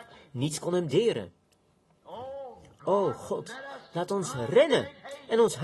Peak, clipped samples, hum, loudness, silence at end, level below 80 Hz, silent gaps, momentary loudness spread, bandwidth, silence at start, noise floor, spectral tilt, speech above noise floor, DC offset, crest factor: -10 dBFS; under 0.1%; none; -28 LUFS; 0 s; -66 dBFS; none; 18 LU; 12.5 kHz; 0 s; -67 dBFS; -5 dB/octave; 40 dB; under 0.1%; 20 dB